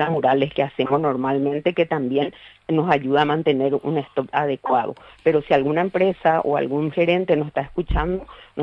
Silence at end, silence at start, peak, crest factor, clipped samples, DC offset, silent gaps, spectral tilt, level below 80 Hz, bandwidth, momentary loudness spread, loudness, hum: 0 s; 0 s; -4 dBFS; 16 dB; under 0.1%; under 0.1%; none; -8.5 dB/octave; -38 dBFS; 6 kHz; 6 LU; -21 LUFS; none